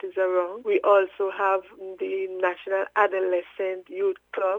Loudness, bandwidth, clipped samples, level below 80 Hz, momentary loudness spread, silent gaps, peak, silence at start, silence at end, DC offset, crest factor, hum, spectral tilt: -25 LUFS; 3.8 kHz; under 0.1%; -74 dBFS; 10 LU; none; -6 dBFS; 0.05 s; 0 s; under 0.1%; 18 dB; none; -5.5 dB/octave